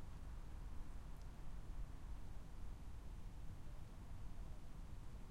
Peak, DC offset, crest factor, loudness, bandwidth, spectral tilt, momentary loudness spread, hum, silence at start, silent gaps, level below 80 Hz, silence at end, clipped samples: -38 dBFS; under 0.1%; 12 dB; -57 LUFS; 14 kHz; -6.5 dB/octave; 2 LU; none; 0 s; none; -52 dBFS; 0 s; under 0.1%